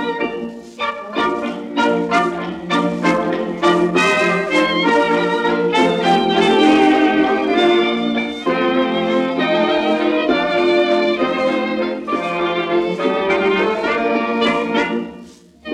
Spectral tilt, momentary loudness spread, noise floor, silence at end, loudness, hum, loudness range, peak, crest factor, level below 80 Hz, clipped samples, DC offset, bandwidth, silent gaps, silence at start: -5 dB/octave; 7 LU; -40 dBFS; 0 s; -16 LUFS; none; 4 LU; -2 dBFS; 16 dB; -52 dBFS; under 0.1%; under 0.1%; 11 kHz; none; 0 s